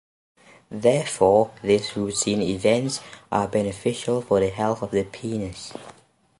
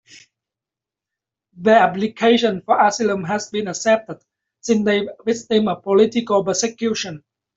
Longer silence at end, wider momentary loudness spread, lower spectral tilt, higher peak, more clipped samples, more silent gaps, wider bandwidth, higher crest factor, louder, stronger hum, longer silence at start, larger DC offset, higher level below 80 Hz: about the same, 0.5 s vs 0.4 s; about the same, 12 LU vs 10 LU; about the same, -5 dB/octave vs -4 dB/octave; about the same, -4 dBFS vs -2 dBFS; neither; neither; first, 11.5 kHz vs 8 kHz; about the same, 20 dB vs 18 dB; second, -23 LUFS vs -18 LUFS; neither; second, 0.7 s vs 1.55 s; neither; first, -52 dBFS vs -62 dBFS